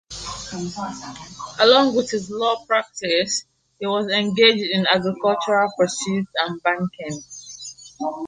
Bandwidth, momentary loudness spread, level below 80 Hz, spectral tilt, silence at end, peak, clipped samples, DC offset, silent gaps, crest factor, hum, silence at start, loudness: 9.8 kHz; 19 LU; -56 dBFS; -3.5 dB/octave; 0 s; -2 dBFS; under 0.1%; under 0.1%; none; 20 dB; none; 0.1 s; -20 LUFS